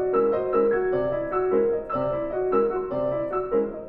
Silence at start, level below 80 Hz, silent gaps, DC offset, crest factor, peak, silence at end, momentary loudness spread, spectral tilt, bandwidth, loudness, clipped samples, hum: 0 s; -48 dBFS; none; under 0.1%; 14 dB; -10 dBFS; 0 s; 4 LU; -10.5 dB/octave; 4.3 kHz; -24 LUFS; under 0.1%; none